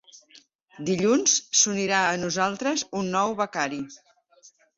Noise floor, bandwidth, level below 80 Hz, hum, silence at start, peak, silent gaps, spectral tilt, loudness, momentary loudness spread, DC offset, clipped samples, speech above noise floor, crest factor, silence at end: -57 dBFS; 8 kHz; -66 dBFS; none; 0.35 s; -6 dBFS; 0.55-0.66 s; -2.5 dB/octave; -23 LUFS; 10 LU; under 0.1%; under 0.1%; 32 dB; 20 dB; 0.3 s